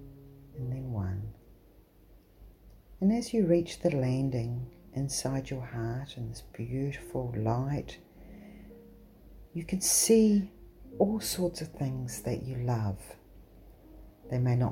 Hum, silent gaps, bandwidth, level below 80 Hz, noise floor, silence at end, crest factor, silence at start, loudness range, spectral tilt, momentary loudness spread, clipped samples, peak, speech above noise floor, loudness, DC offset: none; none; 16.5 kHz; -52 dBFS; -59 dBFS; 0 s; 20 dB; 0 s; 8 LU; -5.5 dB/octave; 20 LU; under 0.1%; -12 dBFS; 29 dB; -31 LUFS; under 0.1%